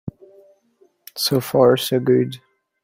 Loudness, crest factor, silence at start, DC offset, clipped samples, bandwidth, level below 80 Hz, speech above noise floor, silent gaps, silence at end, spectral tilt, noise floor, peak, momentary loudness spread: -18 LUFS; 18 dB; 0.05 s; under 0.1%; under 0.1%; 16.5 kHz; -60 dBFS; 42 dB; none; 0.45 s; -5.5 dB/octave; -59 dBFS; -2 dBFS; 21 LU